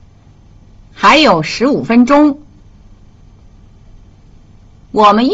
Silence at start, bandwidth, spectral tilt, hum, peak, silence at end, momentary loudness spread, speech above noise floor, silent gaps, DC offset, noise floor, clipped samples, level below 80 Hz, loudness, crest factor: 1 s; 7.8 kHz; -5 dB/octave; none; 0 dBFS; 0 s; 7 LU; 33 dB; none; under 0.1%; -42 dBFS; under 0.1%; -42 dBFS; -10 LUFS; 14 dB